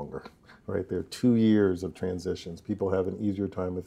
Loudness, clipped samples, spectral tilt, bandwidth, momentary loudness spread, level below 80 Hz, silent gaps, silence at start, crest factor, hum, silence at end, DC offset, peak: -28 LUFS; under 0.1%; -7.5 dB/octave; 13 kHz; 14 LU; -58 dBFS; none; 0 s; 16 dB; none; 0 s; under 0.1%; -12 dBFS